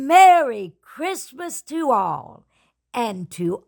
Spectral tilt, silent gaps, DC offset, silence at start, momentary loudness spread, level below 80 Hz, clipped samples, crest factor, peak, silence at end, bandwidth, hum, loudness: -4 dB/octave; none; under 0.1%; 0 s; 19 LU; -68 dBFS; under 0.1%; 16 dB; -2 dBFS; 0.1 s; 19 kHz; none; -19 LUFS